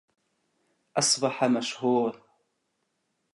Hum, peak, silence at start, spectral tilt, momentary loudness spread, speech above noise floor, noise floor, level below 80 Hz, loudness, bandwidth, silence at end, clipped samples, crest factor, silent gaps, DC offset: none; -10 dBFS; 0.95 s; -3 dB/octave; 7 LU; 52 dB; -77 dBFS; -80 dBFS; -26 LUFS; 11.5 kHz; 1.2 s; under 0.1%; 20 dB; none; under 0.1%